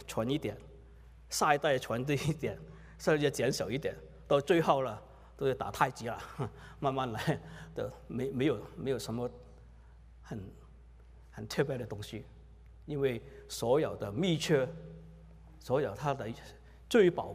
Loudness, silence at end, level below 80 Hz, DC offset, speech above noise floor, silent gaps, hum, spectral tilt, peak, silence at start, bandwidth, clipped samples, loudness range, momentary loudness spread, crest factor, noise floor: -33 LUFS; 0 s; -56 dBFS; under 0.1%; 22 dB; none; none; -5.5 dB/octave; -10 dBFS; 0 s; 15.5 kHz; under 0.1%; 8 LU; 19 LU; 24 dB; -55 dBFS